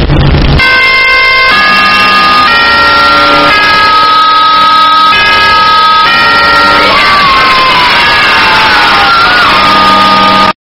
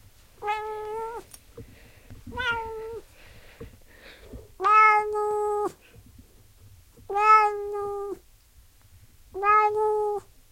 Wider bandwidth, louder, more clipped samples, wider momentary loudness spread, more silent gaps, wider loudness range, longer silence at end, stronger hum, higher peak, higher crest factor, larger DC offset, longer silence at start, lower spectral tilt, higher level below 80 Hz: first, over 20 kHz vs 16.5 kHz; first, -3 LUFS vs -24 LUFS; first, 4% vs under 0.1%; second, 1 LU vs 23 LU; neither; second, 0 LU vs 12 LU; second, 0.15 s vs 0.3 s; neither; first, 0 dBFS vs -6 dBFS; second, 4 dB vs 20 dB; neither; second, 0 s vs 0.4 s; about the same, -4 dB/octave vs -4 dB/octave; first, -20 dBFS vs -54 dBFS